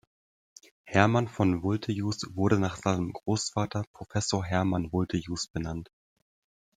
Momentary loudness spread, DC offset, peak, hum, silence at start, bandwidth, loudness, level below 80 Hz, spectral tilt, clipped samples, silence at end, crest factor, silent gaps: 9 LU; under 0.1%; -4 dBFS; none; 0.85 s; 9.6 kHz; -29 LUFS; -56 dBFS; -5.5 dB/octave; under 0.1%; 0.95 s; 26 dB; 3.87-3.94 s